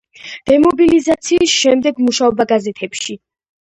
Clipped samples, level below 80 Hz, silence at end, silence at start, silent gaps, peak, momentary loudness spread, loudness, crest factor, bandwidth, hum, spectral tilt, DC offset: under 0.1%; -48 dBFS; 0.45 s; 0.25 s; none; 0 dBFS; 14 LU; -13 LUFS; 14 dB; 11 kHz; none; -3 dB/octave; under 0.1%